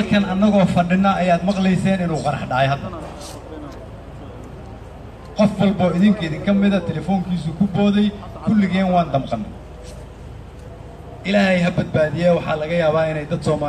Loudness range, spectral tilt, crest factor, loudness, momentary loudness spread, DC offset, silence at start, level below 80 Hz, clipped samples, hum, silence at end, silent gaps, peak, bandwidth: 6 LU; -7.5 dB/octave; 16 dB; -18 LUFS; 21 LU; under 0.1%; 0 s; -40 dBFS; under 0.1%; none; 0 s; none; -4 dBFS; 10 kHz